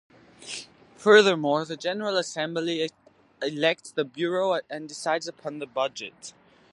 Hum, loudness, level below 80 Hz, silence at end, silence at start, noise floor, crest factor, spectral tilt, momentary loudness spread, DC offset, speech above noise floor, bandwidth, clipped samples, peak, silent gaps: none; -25 LUFS; -78 dBFS; 0.4 s; 0.4 s; -44 dBFS; 22 dB; -3.5 dB/octave; 19 LU; under 0.1%; 19 dB; 11.5 kHz; under 0.1%; -4 dBFS; none